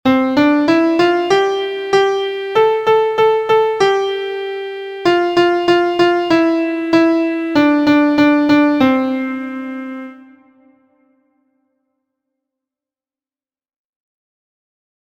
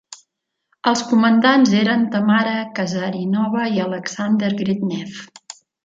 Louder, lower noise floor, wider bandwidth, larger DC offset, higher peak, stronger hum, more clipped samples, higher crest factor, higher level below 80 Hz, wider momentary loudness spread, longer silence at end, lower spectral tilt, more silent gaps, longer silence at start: first, -14 LUFS vs -18 LUFS; first, under -90 dBFS vs -74 dBFS; first, 8.8 kHz vs 7.8 kHz; neither; about the same, 0 dBFS vs -2 dBFS; neither; neither; about the same, 16 dB vs 18 dB; first, -56 dBFS vs -64 dBFS; second, 12 LU vs 15 LU; first, 4.9 s vs 0.3 s; about the same, -5.5 dB/octave vs -5.5 dB/octave; neither; about the same, 0.05 s vs 0.1 s